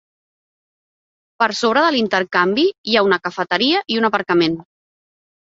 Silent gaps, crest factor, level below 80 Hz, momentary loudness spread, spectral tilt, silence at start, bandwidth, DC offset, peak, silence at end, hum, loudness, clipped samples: 2.78-2.84 s; 18 dB; -62 dBFS; 5 LU; -4.5 dB/octave; 1.4 s; 8 kHz; under 0.1%; -2 dBFS; 0.9 s; none; -17 LUFS; under 0.1%